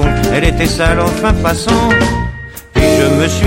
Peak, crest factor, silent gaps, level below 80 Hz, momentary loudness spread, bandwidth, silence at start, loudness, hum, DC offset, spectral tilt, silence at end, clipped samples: 0 dBFS; 12 dB; none; -20 dBFS; 8 LU; 16.5 kHz; 0 s; -12 LUFS; none; under 0.1%; -5.5 dB/octave; 0 s; under 0.1%